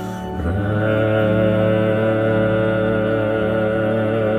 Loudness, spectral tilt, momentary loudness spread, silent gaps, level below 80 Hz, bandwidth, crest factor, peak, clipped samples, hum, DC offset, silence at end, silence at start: -18 LUFS; -8.5 dB/octave; 4 LU; none; -38 dBFS; 9.8 kHz; 12 dB; -6 dBFS; under 0.1%; none; under 0.1%; 0 s; 0 s